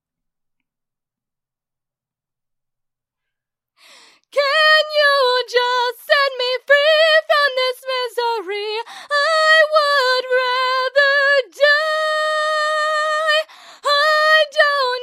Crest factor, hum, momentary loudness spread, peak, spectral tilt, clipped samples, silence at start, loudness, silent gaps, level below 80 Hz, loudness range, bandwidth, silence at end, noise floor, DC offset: 16 dB; none; 9 LU; 0 dBFS; 3 dB/octave; under 0.1%; 4.35 s; -15 LUFS; none; -88 dBFS; 3 LU; 15.5 kHz; 0 s; -86 dBFS; under 0.1%